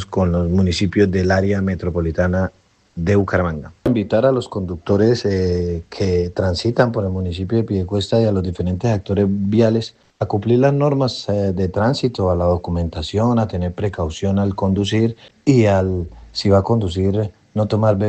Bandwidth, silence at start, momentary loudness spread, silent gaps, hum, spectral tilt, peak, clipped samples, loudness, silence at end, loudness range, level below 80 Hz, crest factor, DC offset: 8.6 kHz; 0 s; 7 LU; none; none; -7.5 dB/octave; 0 dBFS; under 0.1%; -18 LUFS; 0 s; 2 LU; -44 dBFS; 16 dB; under 0.1%